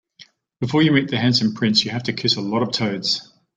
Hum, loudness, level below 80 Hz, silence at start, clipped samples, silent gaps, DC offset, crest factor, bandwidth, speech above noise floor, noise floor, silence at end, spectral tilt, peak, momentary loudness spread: none; -19 LUFS; -58 dBFS; 0.6 s; under 0.1%; none; under 0.1%; 18 dB; 9.2 kHz; 31 dB; -50 dBFS; 0.35 s; -5 dB/octave; -2 dBFS; 6 LU